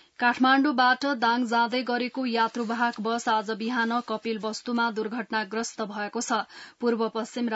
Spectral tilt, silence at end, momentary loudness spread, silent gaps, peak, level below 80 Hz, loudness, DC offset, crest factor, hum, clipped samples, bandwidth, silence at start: -3.5 dB/octave; 0 s; 10 LU; none; -8 dBFS; -78 dBFS; -26 LUFS; under 0.1%; 18 dB; none; under 0.1%; 8 kHz; 0.2 s